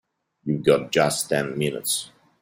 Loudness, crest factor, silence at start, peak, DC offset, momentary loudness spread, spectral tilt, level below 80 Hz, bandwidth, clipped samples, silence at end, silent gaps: -23 LUFS; 20 dB; 0.45 s; -4 dBFS; under 0.1%; 10 LU; -4 dB/octave; -60 dBFS; 16.5 kHz; under 0.1%; 0.35 s; none